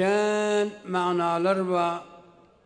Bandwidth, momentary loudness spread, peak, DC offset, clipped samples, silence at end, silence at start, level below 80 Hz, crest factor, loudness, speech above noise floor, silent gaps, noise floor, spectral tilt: 10.5 kHz; 5 LU; -12 dBFS; under 0.1%; under 0.1%; 0.45 s; 0 s; -70 dBFS; 14 dB; -25 LUFS; 29 dB; none; -53 dBFS; -5.5 dB/octave